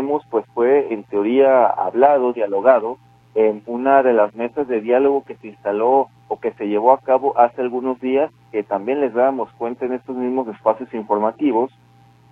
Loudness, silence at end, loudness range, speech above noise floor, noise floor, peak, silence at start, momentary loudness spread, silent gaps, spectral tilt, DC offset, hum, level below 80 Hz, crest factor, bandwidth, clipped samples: -18 LUFS; 0.65 s; 5 LU; 33 dB; -50 dBFS; 0 dBFS; 0 s; 11 LU; none; -8.5 dB/octave; under 0.1%; none; -66 dBFS; 18 dB; 3.9 kHz; under 0.1%